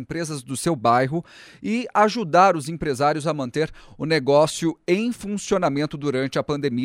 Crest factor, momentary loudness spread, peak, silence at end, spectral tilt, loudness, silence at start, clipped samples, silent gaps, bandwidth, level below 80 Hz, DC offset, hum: 18 dB; 11 LU; -4 dBFS; 0 s; -5.5 dB/octave; -22 LUFS; 0 s; under 0.1%; none; 16 kHz; -52 dBFS; under 0.1%; none